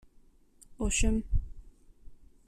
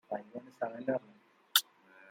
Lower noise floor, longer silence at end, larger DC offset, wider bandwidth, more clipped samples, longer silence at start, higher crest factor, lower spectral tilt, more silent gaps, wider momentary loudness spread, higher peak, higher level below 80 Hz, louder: about the same, -60 dBFS vs -58 dBFS; first, 0.35 s vs 0 s; neither; second, 13 kHz vs 16 kHz; neither; first, 0.7 s vs 0.1 s; second, 18 dB vs 32 dB; first, -4 dB/octave vs -1.5 dB/octave; neither; about the same, 10 LU vs 12 LU; second, -14 dBFS vs -6 dBFS; first, -36 dBFS vs -90 dBFS; about the same, -32 LUFS vs -34 LUFS